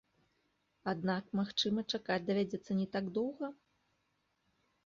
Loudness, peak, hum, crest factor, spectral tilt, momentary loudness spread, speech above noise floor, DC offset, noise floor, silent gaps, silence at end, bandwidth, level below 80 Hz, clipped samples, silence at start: -36 LUFS; -20 dBFS; none; 18 dB; -4 dB/octave; 7 LU; 44 dB; under 0.1%; -80 dBFS; none; 1.35 s; 7.4 kHz; -74 dBFS; under 0.1%; 0.85 s